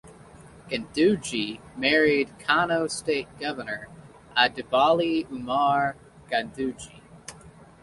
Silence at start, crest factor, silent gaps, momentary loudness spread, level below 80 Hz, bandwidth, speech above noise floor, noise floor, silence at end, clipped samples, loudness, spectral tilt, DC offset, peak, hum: 0.05 s; 22 dB; none; 17 LU; -58 dBFS; 11.5 kHz; 24 dB; -49 dBFS; 0.3 s; under 0.1%; -25 LUFS; -4 dB/octave; under 0.1%; -4 dBFS; none